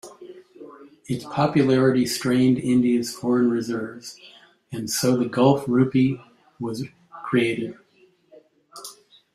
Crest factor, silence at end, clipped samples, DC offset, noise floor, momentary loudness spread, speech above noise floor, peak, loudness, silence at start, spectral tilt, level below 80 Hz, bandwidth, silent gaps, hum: 18 dB; 0.4 s; under 0.1%; under 0.1%; -59 dBFS; 19 LU; 38 dB; -6 dBFS; -22 LUFS; 0.05 s; -6 dB/octave; -62 dBFS; 15 kHz; none; none